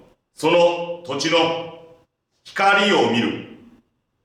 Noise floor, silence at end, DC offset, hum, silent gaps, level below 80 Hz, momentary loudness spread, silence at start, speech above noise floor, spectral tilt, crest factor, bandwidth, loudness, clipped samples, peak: -61 dBFS; 0.7 s; under 0.1%; none; none; -68 dBFS; 14 LU; 0.4 s; 43 dB; -4 dB/octave; 16 dB; 13.5 kHz; -19 LUFS; under 0.1%; -4 dBFS